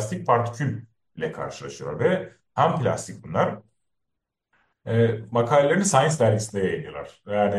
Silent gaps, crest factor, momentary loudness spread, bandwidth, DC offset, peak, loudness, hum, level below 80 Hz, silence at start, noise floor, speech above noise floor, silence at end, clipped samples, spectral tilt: none; 20 dB; 14 LU; 12.5 kHz; under 0.1%; -4 dBFS; -24 LUFS; none; -60 dBFS; 0 s; -82 dBFS; 59 dB; 0 s; under 0.1%; -5.5 dB/octave